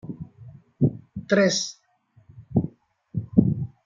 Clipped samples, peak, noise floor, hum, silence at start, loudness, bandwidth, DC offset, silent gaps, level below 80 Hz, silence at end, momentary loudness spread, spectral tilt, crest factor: under 0.1%; -2 dBFS; -58 dBFS; none; 0.05 s; -24 LUFS; 7.8 kHz; under 0.1%; none; -52 dBFS; 0.2 s; 19 LU; -5.5 dB/octave; 24 dB